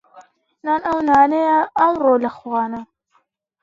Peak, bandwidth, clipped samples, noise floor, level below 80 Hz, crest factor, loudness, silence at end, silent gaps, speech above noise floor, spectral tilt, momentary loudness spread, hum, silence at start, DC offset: -2 dBFS; 7.6 kHz; under 0.1%; -64 dBFS; -56 dBFS; 18 dB; -17 LUFS; 0.8 s; none; 47 dB; -6.5 dB/octave; 11 LU; none; 0.15 s; under 0.1%